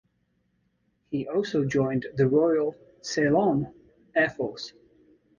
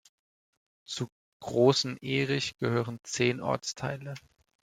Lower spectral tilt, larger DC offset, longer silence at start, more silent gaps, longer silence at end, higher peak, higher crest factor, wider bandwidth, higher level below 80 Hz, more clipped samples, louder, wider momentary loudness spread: first, -6 dB/octave vs -4.5 dB/octave; neither; first, 1.1 s vs 0.9 s; second, none vs 1.12-1.40 s; first, 0.7 s vs 0.45 s; about the same, -10 dBFS vs -8 dBFS; second, 16 dB vs 22 dB; second, 7.4 kHz vs 14.5 kHz; first, -60 dBFS vs -68 dBFS; neither; first, -26 LUFS vs -30 LUFS; second, 13 LU vs 16 LU